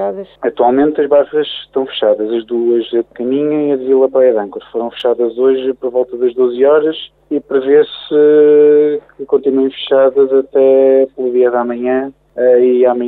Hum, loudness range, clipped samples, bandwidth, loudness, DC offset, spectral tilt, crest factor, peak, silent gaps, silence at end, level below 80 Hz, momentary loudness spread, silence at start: none; 4 LU; under 0.1%; 4.1 kHz; -12 LUFS; under 0.1%; -8 dB/octave; 10 dB; -2 dBFS; none; 0 s; -58 dBFS; 10 LU; 0 s